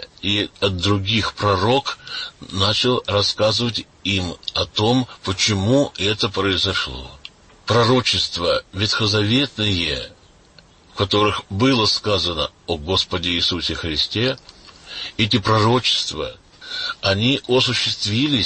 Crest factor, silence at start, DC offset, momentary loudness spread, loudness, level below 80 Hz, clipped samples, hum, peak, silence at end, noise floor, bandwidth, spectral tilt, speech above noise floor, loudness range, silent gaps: 16 dB; 0 s; under 0.1%; 11 LU; -19 LUFS; -44 dBFS; under 0.1%; none; -4 dBFS; 0 s; -50 dBFS; 8.8 kHz; -4.5 dB/octave; 30 dB; 1 LU; none